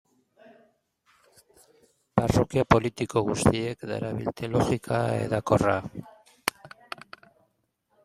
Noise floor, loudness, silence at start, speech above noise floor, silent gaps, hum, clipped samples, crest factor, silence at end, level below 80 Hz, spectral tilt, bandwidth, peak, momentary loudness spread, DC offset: -73 dBFS; -26 LUFS; 2.15 s; 48 dB; none; none; under 0.1%; 26 dB; 1.35 s; -48 dBFS; -6 dB/octave; 15.5 kHz; -2 dBFS; 18 LU; under 0.1%